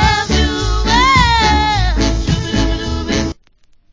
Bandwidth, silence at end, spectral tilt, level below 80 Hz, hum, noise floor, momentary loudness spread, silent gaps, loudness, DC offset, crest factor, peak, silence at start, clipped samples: 7.6 kHz; 0.6 s; -4.5 dB/octave; -20 dBFS; none; -50 dBFS; 8 LU; none; -14 LUFS; under 0.1%; 14 dB; 0 dBFS; 0 s; under 0.1%